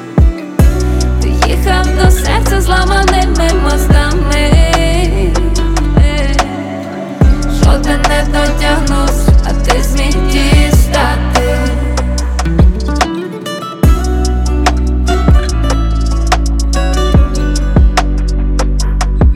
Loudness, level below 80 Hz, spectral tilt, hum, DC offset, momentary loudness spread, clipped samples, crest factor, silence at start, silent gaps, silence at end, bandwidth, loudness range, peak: -12 LUFS; -12 dBFS; -5.5 dB/octave; none; under 0.1%; 5 LU; under 0.1%; 10 dB; 0 s; none; 0 s; 15.5 kHz; 2 LU; 0 dBFS